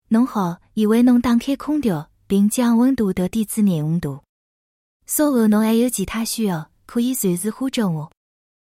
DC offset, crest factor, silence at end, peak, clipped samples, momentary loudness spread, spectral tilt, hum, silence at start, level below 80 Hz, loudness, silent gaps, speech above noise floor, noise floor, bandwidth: under 0.1%; 14 dB; 0.7 s; -6 dBFS; under 0.1%; 9 LU; -5.5 dB/octave; none; 0.1 s; -50 dBFS; -19 LUFS; 4.29-5.00 s; over 72 dB; under -90 dBFS; 16.5 kHz